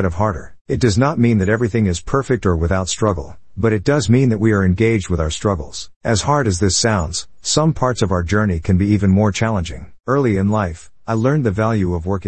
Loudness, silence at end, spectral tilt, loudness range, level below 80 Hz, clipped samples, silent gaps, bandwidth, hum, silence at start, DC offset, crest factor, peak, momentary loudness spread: -17 LUFS; 0 s; -5.5 dB/octave; 1 LU; -36 dBFS; under 0.1%; 0.61-0.65 s, 5.96-6.01 s; 8.8 kHz; none; 0 s; 0.8%; 16 dB; -2 dBFS; 9 LU